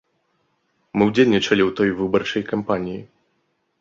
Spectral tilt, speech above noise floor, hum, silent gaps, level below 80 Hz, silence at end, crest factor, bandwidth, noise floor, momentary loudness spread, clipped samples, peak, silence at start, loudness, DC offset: -6 dB/octave; 50 dB; none; none; -54 dBFS; 0.75 s; 20 dB; 7.6 kHz; -69 dBFS; 11 LU; under 0.1%; -2 dBFS; 0.95 s; -20 LUFS; under 0.1%